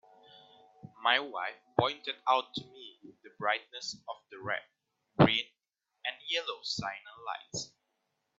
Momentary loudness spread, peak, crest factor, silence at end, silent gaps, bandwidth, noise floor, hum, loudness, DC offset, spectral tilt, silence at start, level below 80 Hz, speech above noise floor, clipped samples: 17 LU; -6 dBFS; 28 dB; 0.75 s; none; 8 kHz; -85 dBFS; none; -33 LUFS; under 0.1%; -2.5 dB/octave; 0.85 s; -68 dBFS; 52 dB; under 0.1%